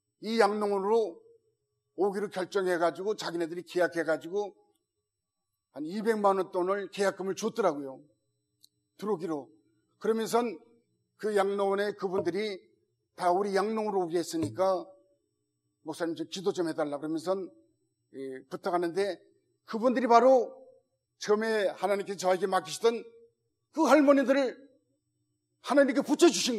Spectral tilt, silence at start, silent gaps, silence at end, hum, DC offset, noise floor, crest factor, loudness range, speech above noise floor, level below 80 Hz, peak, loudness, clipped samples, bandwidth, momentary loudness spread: -4.5 dB/octave; 0.2 s; none; 0 s; none; under 0.1%; -86 dBFS; 22 dB; 7 LU; 58 dB; -84 dBFS; -8 dBFS; -29 LUFS; under 0.1%; 14.5 kHz; 16 LU